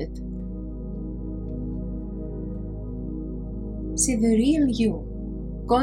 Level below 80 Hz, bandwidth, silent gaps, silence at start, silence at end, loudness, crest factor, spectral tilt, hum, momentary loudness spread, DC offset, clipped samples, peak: -34 dBFS; 16 kHz; none; 0 s; 0 s; -27 LUFS; 18 dB; -5.5 dB/octave; none; 14 LU; under 0.1%; under 0.1%; -8 dBFS